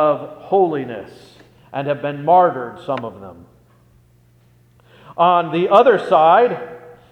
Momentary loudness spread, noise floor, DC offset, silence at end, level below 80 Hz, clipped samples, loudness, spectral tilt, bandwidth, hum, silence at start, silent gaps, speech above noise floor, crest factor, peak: 18 LU; -53 dBFS; under 0.1%; 0.25 s; -62 dBFS; under 0.1%; -16 LUFS; -7.5 dB/octave; 8.8 kHz; 60 Hz at -50 dBFS; 0 s; none; 37 dB; 18 dB; 0 dBFS